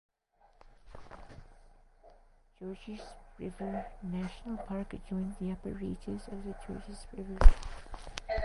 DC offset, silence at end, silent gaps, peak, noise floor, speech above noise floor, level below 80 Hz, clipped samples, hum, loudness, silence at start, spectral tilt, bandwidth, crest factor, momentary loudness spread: under 0.1%; 0 s; none; -4 dBFS; -67 dBFS; 38 dB; -34 dBFS; under 0.1%; none; -38 LUFS; 0.9 s; -7 dB/octave; 11 kHz; 28 dB; 22 LU